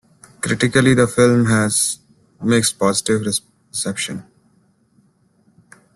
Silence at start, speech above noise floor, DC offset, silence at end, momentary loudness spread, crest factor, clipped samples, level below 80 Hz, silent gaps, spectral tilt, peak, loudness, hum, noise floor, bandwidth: 0.45 s; 42 dB; under 0.1%; 1.75 s; 13 LU; 18 dB; under 0.1%; -50 dBFS; none; -4.5 dB/octave; -2 dBFS; -17 LUFS; none; -58 dBFS; 12.5 kHz